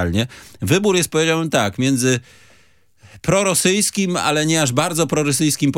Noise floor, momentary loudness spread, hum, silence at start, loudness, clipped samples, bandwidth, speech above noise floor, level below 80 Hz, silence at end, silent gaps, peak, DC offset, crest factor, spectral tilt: -56 dBFS; 6 LU; none; 0 s; -17 LUFS; under 0.1%; 17 kHz; 38 dB; -50 dBFS; 0 s; none; -2 dBFS; under 0.1%; 16 dB; -4 dB/octave